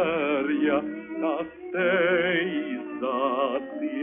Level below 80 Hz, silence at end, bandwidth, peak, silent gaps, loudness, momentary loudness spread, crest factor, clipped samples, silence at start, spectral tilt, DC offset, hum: -64 dBFS; 0 s; 3.7 kHz; -12 dBFS; none; -26 LUFS; 10 LU; 14 dB; under 0.1%; 0 s; -3 dB/octave; under 0.1%; none